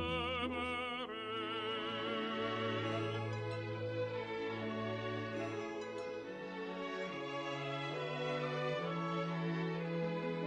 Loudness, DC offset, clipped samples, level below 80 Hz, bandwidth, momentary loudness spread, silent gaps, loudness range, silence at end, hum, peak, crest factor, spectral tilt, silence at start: -40 LUFS; under 0.1%; under 0.1%; -68 dBFS; 9.4 kHz; 5 LU; none; 3 LU; 0 s; none; -26 dBFS; 14 dB; -6 dB/octave; 0 s